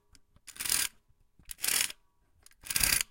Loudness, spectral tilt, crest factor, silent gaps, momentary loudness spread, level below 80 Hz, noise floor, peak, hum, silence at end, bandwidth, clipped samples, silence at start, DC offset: -29 LUFS; 1 dB/octave; 28 dB; none; 23 LU; -54 dBFS; -67 dBFS; -6 dBFS; none; 0.05 s; 17 kHz; under 0.1%; 0.45 s; under 0.1%